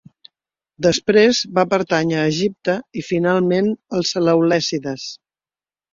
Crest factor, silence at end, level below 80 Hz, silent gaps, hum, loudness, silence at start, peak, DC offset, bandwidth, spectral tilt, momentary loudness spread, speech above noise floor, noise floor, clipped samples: 16 dB; 0.8 s; -56 dBFS; none; none; -18 LUFS; 0.8 s; -2 dBFS; under 0.1%; 7.6 kHz; -5 dB/octave; 10 LU; over 72 dB; under -90 dBFS; under 0.1%